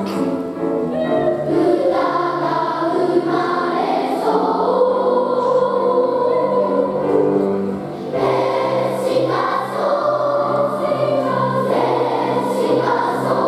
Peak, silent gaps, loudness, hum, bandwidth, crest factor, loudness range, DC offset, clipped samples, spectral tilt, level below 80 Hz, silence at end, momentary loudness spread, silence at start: -4 dBFS; none; -18 LUFS; none; 13.5 kHz; 14 dB; 2 LU; under 0.1%; under 0.1%; -7 dB/octave; -58 dBFS; 0 s; 4 LU; 0 s